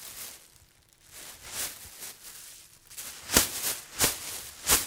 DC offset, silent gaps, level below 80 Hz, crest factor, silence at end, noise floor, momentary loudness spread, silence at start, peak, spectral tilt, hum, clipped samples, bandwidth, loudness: under 0.1%; none; -52 dBFS; 30 dB; 0 s; -60 dBFS; 21 LU; 0 s; -2 dBFS; -0.5 dB/octave; none; under 0.1%; 17.5 kHz; -29 LUFS